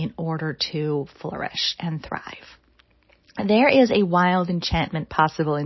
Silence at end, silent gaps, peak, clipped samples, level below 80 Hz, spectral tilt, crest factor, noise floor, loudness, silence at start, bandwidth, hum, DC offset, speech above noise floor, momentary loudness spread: 0 s; none; -4 dBFS; under 0.1%; -44 dBFS; -6 dB/octave; 20 dB; -59 dBFS; -22 LUFS; 0 s; 6.2 kHz; none; under 0.1%; 37 dB; 16 LU